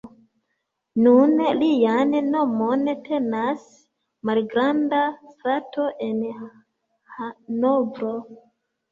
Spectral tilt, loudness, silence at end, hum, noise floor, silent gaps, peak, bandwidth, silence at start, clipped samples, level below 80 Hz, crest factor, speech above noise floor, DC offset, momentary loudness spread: -7 dB/octave; -22 LUFS; 0.55 s; none; -77 dBFS; none; -4 dBFS; 7.4 kHz; 0.05 s; under 0.1%; -68 dBFS; 18 dB; 56 dB; under 0.1%; 14 LU